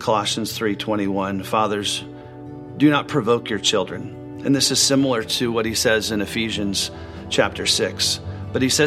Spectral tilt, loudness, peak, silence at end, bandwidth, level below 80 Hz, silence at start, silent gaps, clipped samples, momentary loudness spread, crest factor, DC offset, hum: -3.5 dB/octave; -20 LUFS; -2 dBFS; 0 s; 16 kHz; -48 dBFS; 0 s; none; under 0.1%; 11 LU; 18 dB; under 0.1%; none